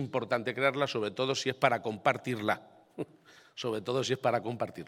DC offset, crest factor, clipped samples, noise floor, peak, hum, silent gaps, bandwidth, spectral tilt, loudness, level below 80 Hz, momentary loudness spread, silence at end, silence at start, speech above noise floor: under 0.1%; 24 dB; under 0.1%; -59 dBFS; -8 dBFS; none; none; 16 kHz; -4.5 dB/octave; -31 LUFS; -76 dBFS; 14 LU; 0 s; 0 s; 28 dB